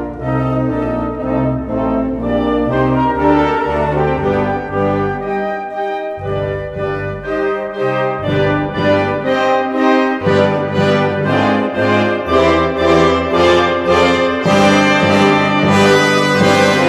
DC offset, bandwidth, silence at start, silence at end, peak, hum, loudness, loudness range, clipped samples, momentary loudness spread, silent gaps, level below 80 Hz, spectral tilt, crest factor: under 0.1%; 13.5 kHz; 0 s; 0 s; 0 dBFS; none; -14 LUFS; 7 LU; under 0.1%; 9 LU; none; -34 dBFS; -6 dB/octave; 14 dB